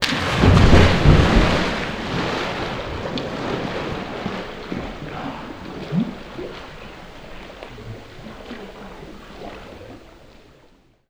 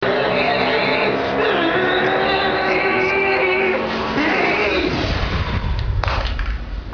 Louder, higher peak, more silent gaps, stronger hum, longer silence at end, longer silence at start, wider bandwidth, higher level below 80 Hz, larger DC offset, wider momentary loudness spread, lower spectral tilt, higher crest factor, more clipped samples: about the same, -20 LUFS vs -18 LUFS; about the same, 0 dBFS vs -2 dBFS; neither; neither; first, 1 s vs 0 s; about the same, 0 s vs 0 s; first, 12.5 kHz vs 5.4 kHz; about the same, -28 dBFS vs -28 dBFS; second, under 0.1% vs 0.2%; first, 24 LU vs 6 LU; about the same, -6 dB/octave vs -6 dB/octave; about the same, 20 dB vs 18 dB; neither